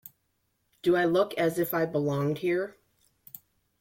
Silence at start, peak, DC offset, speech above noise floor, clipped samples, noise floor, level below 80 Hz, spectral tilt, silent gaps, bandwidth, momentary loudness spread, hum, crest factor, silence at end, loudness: 0.85 s; -12 dBFS; under 0.1%; 49 dB; under 0.1%; -75 dBFS; -68 dBFS; -6.5 dB/octave; none; 16.5 kHz; 23 LU; none; 16 dB; 1.1 s; -28 LUFS